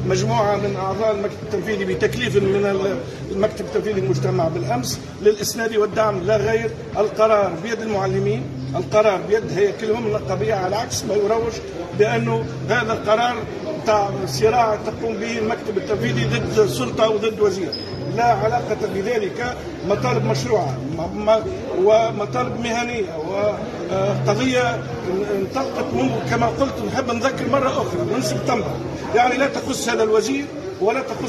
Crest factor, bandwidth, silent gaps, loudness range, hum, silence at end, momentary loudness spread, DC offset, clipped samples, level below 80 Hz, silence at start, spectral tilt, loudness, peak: 16 dB; 13 kHz; none; 2 LU; none; 0 s; 7 LU; under 0.1%; under 0.1%; -46 dBFS; 0 s; -5.5 dB/octave; -21 LUFS; -4 dBFS